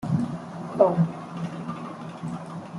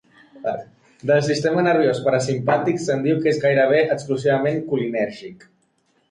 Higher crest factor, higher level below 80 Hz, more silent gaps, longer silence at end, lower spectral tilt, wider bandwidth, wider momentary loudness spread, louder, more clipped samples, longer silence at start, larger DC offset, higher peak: first, 22 dB vs 14 dB; about the same, -62 dBFS vs -62 dBFS; neither; second, 0 s vs 0.75 s; first, -8.5 dB/octave vs -6 dB/octave; about the same, 11.5 kHz vs 11 kHz; first, 15 LU vs 11 LU; second, -28 LUFS vs -20 LUFS; neither; second, 0 s vs 0.35 s; neither; about the same, -6 dBFS vs -6 dBFS